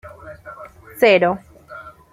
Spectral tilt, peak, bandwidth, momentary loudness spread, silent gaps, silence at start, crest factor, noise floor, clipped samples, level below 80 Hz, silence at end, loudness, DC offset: -5.5 dB/octave; -2 dBFS; 16 kHz; 25 LU; none; 0.05 s; 18 dB; -39 dBFS; under 0.1%; -54 dBFS; 0.25 s; -16 LUFS; under 0.1%